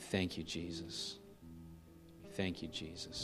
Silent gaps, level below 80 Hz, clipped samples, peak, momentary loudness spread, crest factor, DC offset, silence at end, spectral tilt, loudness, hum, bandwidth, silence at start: none; -64 dBFS; under 0.1%; -22 dBFS; 18 LU; 22 dB; under 0.1%; 0 s; -4.5 dB/octave; -43 LUFS; none; 15 kHz; 0 s